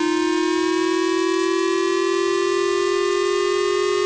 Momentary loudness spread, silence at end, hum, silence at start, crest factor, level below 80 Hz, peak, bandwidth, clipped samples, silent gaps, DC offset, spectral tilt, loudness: 0 LU; 0 s; none; 0 s; 4 dB; -58 dBFS; -16 dBFS; 8 kHz; under 0.1%; none; under 0.1%; -2.5 dB/octave; -20 LUFS